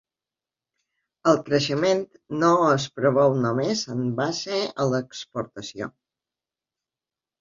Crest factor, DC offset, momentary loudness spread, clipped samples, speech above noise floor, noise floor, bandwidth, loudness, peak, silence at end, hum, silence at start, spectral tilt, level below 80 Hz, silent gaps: 20 dB; under 0.1%; 14 LU; under 0.1%; over 67 dB; under -90 dBFS; 7.6 kHz; -23 LUFS; -6 dBFS; 1.5 s; none; 1.25 s; -5.5 dB/octave; -64 dBFS; none